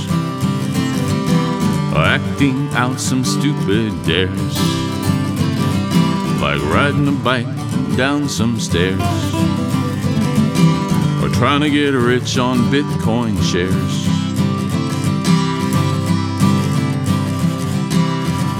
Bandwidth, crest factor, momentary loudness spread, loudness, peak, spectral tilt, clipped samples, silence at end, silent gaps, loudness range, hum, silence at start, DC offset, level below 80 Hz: 16.5 kHz; 14 dB; 4 LU; -17 LUFS; -2 dBFS; -5.5 dB/octave; under 0.1%; 0 s; none; 2 LU; none; 0 s; under 0.1%; -40 dBFS